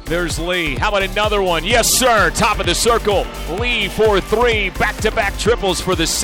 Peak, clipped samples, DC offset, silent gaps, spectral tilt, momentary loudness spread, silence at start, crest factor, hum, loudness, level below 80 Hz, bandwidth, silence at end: -4 dBFS; under 0.1%; 0.2%; none; -3 dB/octave; 6 LU; 0 s; 12 dB; none; -16 LUFS; -28 dBFS; 19.5 kHz; 0 s